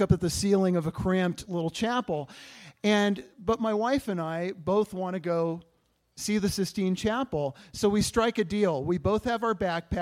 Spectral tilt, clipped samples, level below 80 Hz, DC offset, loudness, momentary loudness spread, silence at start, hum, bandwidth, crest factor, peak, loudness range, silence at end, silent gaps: -5.5 dB/octave; under 0.1%; -50 dBFS; under 0.1%; -28 LUFS; 8 LU; 0 s; none; 16 kHz; 20 dB; -8 dBFS; 2 LU; 0 s; none